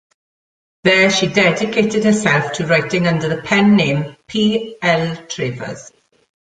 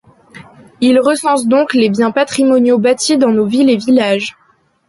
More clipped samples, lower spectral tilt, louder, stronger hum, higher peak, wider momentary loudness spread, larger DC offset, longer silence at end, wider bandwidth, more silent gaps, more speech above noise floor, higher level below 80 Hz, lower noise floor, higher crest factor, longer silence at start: neither; about the same, -5 dB/octave vs -4.5 dB/octave; second, -15 LUFS vs -12 LUFS; neither; about the same, 0 dBFS vs -2 dBFS; first, 11 LU vs 4 LU; neither; about the same, 0.6 s vs 0.55 s; second, 9.2 kHz vs 11.5 kHz; neither; first, over 74 dB vs 27 dB; about the same, -54 dBFS vs -58 dBFS; first, under -90 dBFS vs -38 dBFS; about the same, 16 dB vs 12 dB; first, 0.85 s vs 0.35 s